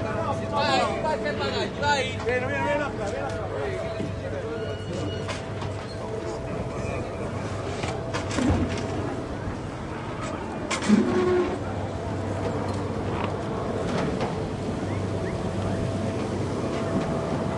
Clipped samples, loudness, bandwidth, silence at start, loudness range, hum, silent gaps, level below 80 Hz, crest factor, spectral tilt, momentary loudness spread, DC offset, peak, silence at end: under 0.1%; -28 LUFS; 11.5 kHz; 0 s; 5 LU; none; none; -44 dBFS; 20 dB; -6 dB/octave; 8 LU; under 0.1%; -8 dBFS; 0 s